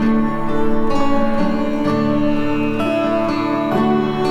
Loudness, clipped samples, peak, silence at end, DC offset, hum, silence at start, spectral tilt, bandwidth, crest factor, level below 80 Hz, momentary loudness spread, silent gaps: -18 LUFS; under 0.1%; -2 dBFS; 0 s; under 0.1%; none; 0 s; -7.5 dB/octave; 7.8 kHz; 12 dB; -30 dBFS; 2 LU; none